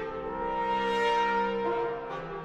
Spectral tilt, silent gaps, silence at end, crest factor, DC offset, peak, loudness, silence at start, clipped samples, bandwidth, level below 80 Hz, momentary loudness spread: -5 dB/octave; none; 0 s; 14 dB; under 0.1%; -16 dBFS; -29 LUFS; 0 s; under 0.1%; 11.5 kHz; -54 dBFS; 9 LU